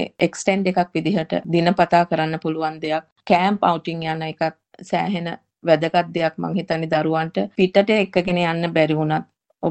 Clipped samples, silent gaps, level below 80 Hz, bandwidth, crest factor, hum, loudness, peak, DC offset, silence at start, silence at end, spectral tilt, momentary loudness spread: under 0.1%; 3.12-3.16 s; -58 dBFS; 8.8 kHz; 18 dB; none; -20 LUFS; -2 dBFS; under 0.1%; 0 s; 0 s; -6 dB/octave; 9 LU